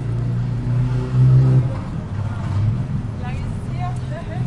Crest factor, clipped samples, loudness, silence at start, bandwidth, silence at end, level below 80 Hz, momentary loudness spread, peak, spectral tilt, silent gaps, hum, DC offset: 14 dB; under 0.1%; -20 LUFS; 0 s; 5.6 kHz; 0 s; -34 dBFS; 12 LU; -6 dBFS; -9 dB/octave; none; none; under 0.1%